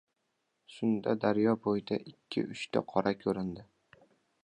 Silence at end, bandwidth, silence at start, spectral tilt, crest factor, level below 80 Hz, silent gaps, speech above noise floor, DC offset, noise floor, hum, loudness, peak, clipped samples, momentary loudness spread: 0.85 s; 10 kHz; 0.7 s; -7 dB/octave; 22 dB; -68 dBFS; none; 49 dB; under 0.1%; -81 dBFS; none; -32 LUFS; -12 dBFS; under 0.1%; 9 LU